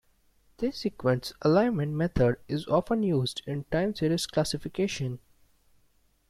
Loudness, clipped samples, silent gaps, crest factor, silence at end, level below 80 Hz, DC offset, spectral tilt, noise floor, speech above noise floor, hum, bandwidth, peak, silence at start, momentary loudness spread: -28 LUFS; under 0.1%; none; 18 dB; 1.1 s; -50 dBFS; under 0.1%; -6 dB/octave; -66 dBFS; 39 dB; none; 15 kHz; -10 dBFS; 0.6 s; 9 LU